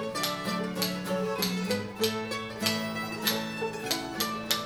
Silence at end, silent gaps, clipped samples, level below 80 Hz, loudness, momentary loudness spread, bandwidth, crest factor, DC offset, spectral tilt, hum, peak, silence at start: 0 s; none; under 0.1%; -62 dBFS; -30 LUFS; 4 LU; over 20 kHz; 22 dB; under 0.1%; -3.5 dB/octave; none; -8 dBFS; 0 s